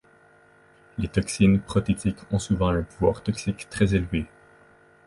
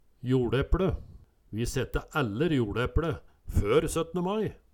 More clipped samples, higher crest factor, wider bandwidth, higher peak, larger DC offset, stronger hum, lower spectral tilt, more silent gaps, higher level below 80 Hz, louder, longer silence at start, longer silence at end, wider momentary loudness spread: neither; about the same, 18 dB vs 16 dB; second, 11.5 kHz vs 18.5 kHz; first, -6 dBFS vs -12 dBFS; neither; neither; about the same, -6.5 dB/octave vs -6.5 dB/octave; neither; about the same, -40 dBFS vs -36 dBFS; first, -25 LUFS vs -29 LUFS; first, 1 s vs 0.25 s; first, 0.8 s vs 0.2 s; about the same, 10 LU vs 8 LU